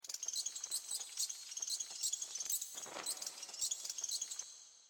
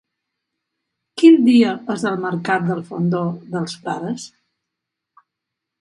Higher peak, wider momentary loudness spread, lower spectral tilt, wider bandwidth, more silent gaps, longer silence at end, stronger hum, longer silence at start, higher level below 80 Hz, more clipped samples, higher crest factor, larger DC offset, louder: second, -26 dBFS vs 0 dBFS; second, 5 LU vs 15 LU; second, 3 dB/octave vs -6.5 dB/octave; first, 17.5 kHz vs 11 kHz; neither; second, 0 s vs 1.55 s; neither; second, 0.05 s vs 1.15 s; second, -86 dBFS vs -68 dBFS; neither; about the same, 18 dB vs 18 dB; neither; second, -40 LUFS vs -18 LUFS